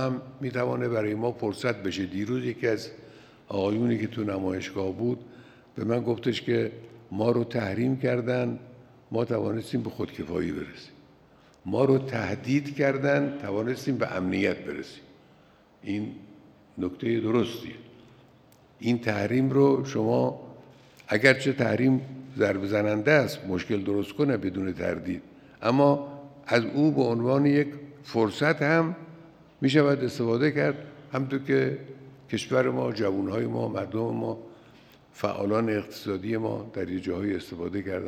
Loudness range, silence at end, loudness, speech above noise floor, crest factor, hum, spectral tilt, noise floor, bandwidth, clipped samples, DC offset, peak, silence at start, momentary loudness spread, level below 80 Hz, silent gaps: 6 LU; 0 s; -27 LUFS; 31 dB; 24 dB; none; -7 dB/octave; -58 dBFS; 14.5 kHz; under 0.1%; under 0.1%; -2 dBFS; 0 s; 13 LU; -66 dBFS; none